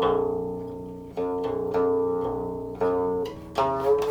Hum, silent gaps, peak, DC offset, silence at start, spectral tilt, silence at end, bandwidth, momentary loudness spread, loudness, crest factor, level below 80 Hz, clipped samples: 60 Hz at -50 dBFS; none; -12 dBFS; under 0.1%; 0 s; -7 dB/octave; 0 s; 14.5 kHz; 10 LU; -27 LUFS; 14 dB; -50 dBFS; under 0.1%